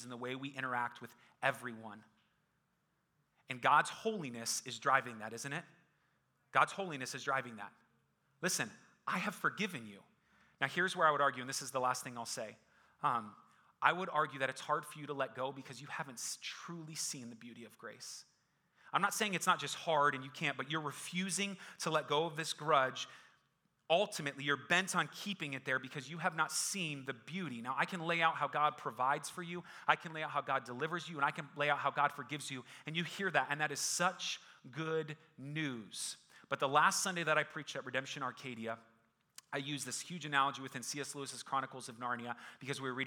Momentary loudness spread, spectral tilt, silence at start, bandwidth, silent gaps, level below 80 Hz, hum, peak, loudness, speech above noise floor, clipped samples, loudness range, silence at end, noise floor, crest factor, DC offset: 13 LU; -3 dB/octave; 0 s; over 20 kHz; none; -90 dBFS; none; -12 dBFS; -37 LUFS; 43 dB; under 0.1%; 4 LU; 0 s; -80 dBFS; 26 dB; under 0.1%